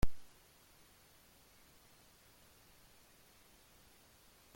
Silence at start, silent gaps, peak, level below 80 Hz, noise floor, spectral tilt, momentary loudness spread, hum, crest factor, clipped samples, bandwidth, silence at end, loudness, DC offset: 0.05 s; none; -18 dBFS; -52 dBFS; -65 dBFS; -5.5 dB/octave; 0 LU; none; 24 dB; under 0.1%; 16.5 kHz; 4.35 s; -59 LUFS; under 0.1%